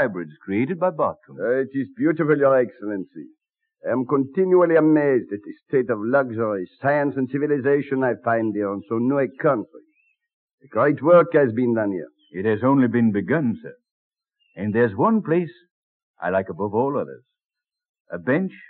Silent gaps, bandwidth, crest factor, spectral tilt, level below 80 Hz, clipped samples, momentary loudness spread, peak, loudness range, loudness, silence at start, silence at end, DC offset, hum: 10.33-10.58 s, 13.91-14.11 s, 15.71-16.14 s, 17.89-17.94 s, 18.00-18.05 s; 4.3 kHz; 16 dB; -12 dB/octave; -72 dBFS; under 0.1%; 13 LU; -4 dBFS; 4 LU; -21 LUFS; 0 s; 0.15 s; under 0.1%; none